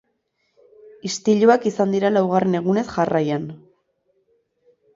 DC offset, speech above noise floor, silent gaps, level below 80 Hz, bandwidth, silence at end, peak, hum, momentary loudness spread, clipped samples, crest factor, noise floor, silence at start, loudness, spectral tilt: under 0.1%; 52 dB; none; -62 dBFS; 7.8 kHz; 1.4 s; -2 dBFS; none; 12 LU; under 0.1%; 18 dB; -70 dBFS; 1.05 s; -19 LUFS; -6 dB/octave